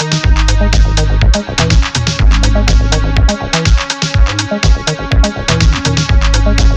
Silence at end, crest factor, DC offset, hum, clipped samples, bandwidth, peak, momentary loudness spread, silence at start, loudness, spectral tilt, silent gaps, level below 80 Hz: 0 s; 10 dB; under 0.1%; none; under 0.1%; 9 kHz; 0 dBFS; 2 LU; 0 s; -12 LUFS; -4.5 dB/octave; none; -12 dBFS